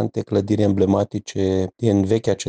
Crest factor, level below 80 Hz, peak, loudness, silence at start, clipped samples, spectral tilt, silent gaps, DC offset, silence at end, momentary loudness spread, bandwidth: 14 dB; -56 dBFS; -6 dBFS; -20 LUFS; 0 s; under 0.1%; -7 dB/octave; none; under 0.1%; 0 s; 5 LU; 9.6 kHz